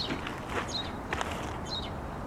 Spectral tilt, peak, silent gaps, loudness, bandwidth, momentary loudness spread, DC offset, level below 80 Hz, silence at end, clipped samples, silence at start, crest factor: -4 dB/octave; -10 dBFS; none; -35 LUFS; 17 kHz; 3 LU; under 0.1%; -46 dBFS; 0 s; under 0.1%; 0 s; 24 dB